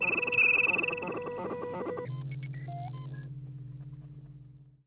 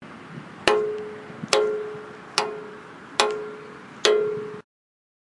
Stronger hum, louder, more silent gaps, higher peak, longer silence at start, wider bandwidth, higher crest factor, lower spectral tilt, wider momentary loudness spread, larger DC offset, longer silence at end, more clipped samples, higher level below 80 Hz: neither; second, -29 LUFS vs -25 LUFS; neither; second, -16 dBFS vs 0 dBFS; about the same, 0 s vs 0 s; second, 4 kHz vs 11.5 kHz; second, 16 dB vs 26 dB; first, -4 dB/octave vs -2.5 dB/octave; first, 23 LU vs 19 LU; neither; second, 0.15 s vs 0.6 s; neither; about the same, -64 dBFS vs -62 dBFS